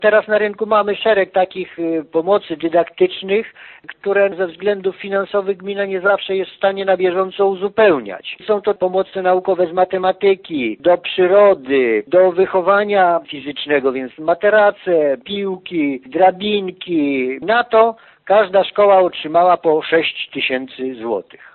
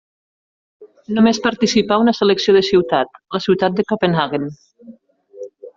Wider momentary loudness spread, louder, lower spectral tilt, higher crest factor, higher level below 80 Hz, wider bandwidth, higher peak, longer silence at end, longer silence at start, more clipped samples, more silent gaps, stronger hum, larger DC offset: second, 9 LU vs 12 LU; about the same, -16 LUFS vs -16 LUFS; first, -10 dB/octave vs -4 dB/octave; about the same, 16 dB vs 16 dB; about the same, -60 dBFS vs -56 dBFS; second, 4.4 kHz vs 7.6 kHz; about the same, 0 dBFS vs -2 dBFS; first, 0.35 s vs 0.1 s; second, 0 s vs 0.8 s; neither; neither; neither; neither